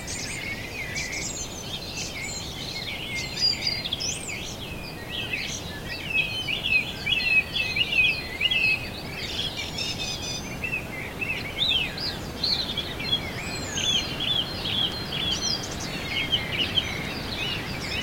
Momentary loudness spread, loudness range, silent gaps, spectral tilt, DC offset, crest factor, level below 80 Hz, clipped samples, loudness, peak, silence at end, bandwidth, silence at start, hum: 10 LU; 5 LU; none; -2 dB/octave; under 0.1%; 18 dB; -46 dBFS; under 0.1%; -26 LUFS; -10 dBFS; 0 s; 16.5 kHz; 0 s; none